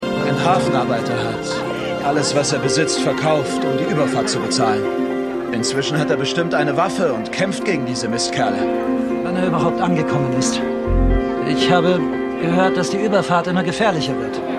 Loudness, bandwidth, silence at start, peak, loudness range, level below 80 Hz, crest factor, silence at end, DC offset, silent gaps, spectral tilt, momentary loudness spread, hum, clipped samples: -18 LUFS; 13 kHz; 0 s; -2 dBFS; 2 LU; -32 dBFS; 18 dB; 0 s; under 0.1%; none; -5 dB/octave; 5 LU; none; under 0.1%